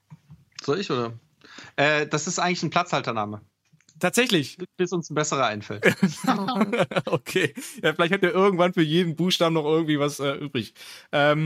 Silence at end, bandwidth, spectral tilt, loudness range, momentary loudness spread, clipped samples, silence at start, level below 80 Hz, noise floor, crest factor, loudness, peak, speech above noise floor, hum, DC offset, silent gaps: 0 s; 16 kHz; -4.5 dB/octave; 3 LU; 10 LU; under 0.1%; 0.1 s; -70 dBFS; -57 dBFS; 22 dB; -24 LUFS; -4 dBFS; 34 dB; none; under 0.1%; none